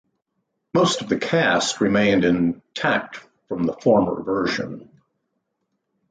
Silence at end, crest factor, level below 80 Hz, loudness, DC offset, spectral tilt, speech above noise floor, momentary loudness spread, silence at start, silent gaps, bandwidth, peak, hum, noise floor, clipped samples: 1.3 s; 16 dB; -54 dBFS; -21 LUFS; under 0.1%; -4.5 dB/octave; 55 dB; 13 LU; 0.75 s; none; 9.4 kHz; -6 dBFS; none; -75 dBFS; under 0.1%